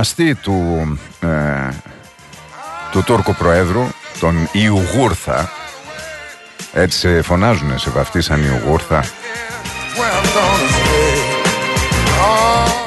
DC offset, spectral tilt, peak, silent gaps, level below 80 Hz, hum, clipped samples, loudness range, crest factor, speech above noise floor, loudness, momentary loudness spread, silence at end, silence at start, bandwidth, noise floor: under 0.1%; -4.5 dB/octave; 0 dBFS; none; -28 dBFS; none; under 0.1%; 3 LU; 16 dB; 23 dB; -15 LUFS; 15 LU; 0 s; 0 s; 12.5 kHz; -38 dBFS